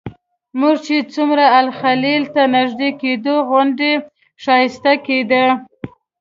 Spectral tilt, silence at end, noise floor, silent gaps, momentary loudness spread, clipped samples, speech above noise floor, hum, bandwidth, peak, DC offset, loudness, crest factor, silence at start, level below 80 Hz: -5 dB/octave; 0.35 s; -34 dBFS; none; 11 LU; under 0.1%; 19 dB; none; 7.6 kHz; 0 dBFS; under 0.1%; -15 LUFS; 16 dB; 0.05 s; -58 dBFS